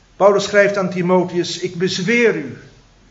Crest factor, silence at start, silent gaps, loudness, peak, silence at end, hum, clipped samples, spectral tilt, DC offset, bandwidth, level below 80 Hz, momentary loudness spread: 18 dB; 0.2 s; none; -16 LUFS; 0 dBFS; 0.5 s; none; under 0.1%; -5 dB/octave; under 0.1%; 8 kHz; -56 dBFS; 8 LU